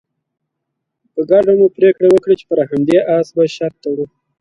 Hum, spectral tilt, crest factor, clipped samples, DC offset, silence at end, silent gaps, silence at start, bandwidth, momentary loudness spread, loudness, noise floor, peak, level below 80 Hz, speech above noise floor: none; -7.5 dB/octave; 14 dB; under 0.1%; under 0.1%; 0.35 s; none; 1.15 s; 8.8 kHz; 12 LU; -14 LUFS; -76 dBFS; 0 dBFS; -56 dBFS; 63 dB